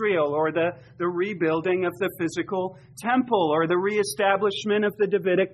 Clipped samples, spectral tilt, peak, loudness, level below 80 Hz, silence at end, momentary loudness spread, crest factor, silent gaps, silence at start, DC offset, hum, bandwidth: under 0.1%; -5 dB/octave; -8 dBFS; -24 LUFS; -66 dBFS; 0.05 s; 7 LU; 16 dB; none; 0 s; under 0.1%; none; 13.5 kHz